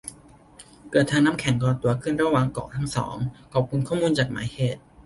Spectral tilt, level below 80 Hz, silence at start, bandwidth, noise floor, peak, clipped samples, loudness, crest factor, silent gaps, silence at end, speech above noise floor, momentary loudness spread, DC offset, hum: -6 dB/octave; -50 dBFS; 0.05 s; 11.5 kHz; -50 dBFS; -6 dBFS; under 0.1%; -24 LUFS; 18 dB; none; 0.05 s; 27 dB; 7 LU; under 0.1%; none